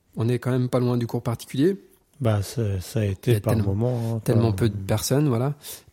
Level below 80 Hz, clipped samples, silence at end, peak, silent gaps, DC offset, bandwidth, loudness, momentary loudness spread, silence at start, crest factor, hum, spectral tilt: -54 dBFS; under 0.1%; 0.15 s; -6 dBFS; none; under 0.1%; 16.5 kHz; -24 LUFS; 6 LU; 0.15 s; 16 dB; none; -7 dB/octave